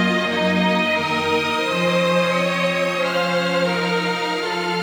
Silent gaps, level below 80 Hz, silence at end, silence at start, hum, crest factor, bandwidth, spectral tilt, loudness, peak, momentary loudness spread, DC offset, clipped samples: none; -62 dBFS; 0 s; 0 s; none; 14 dB; over 20 kHz; -5 dB/octave; -19 LUFS; -6 dBFS; 3 LU; under 0.1%; under 0.1%